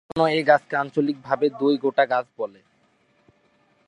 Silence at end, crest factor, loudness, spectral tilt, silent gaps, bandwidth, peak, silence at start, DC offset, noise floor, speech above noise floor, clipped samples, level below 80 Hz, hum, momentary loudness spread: 1.4 s; 20 dB; -22 LUFS; -6.5 dB/octave; none; 10.5 kHz; -4 dBFS; 0.15 s; under 0.1%; -64 dBFS; 42 dB; under 0.1%; -66 dBFS; none; 11 LU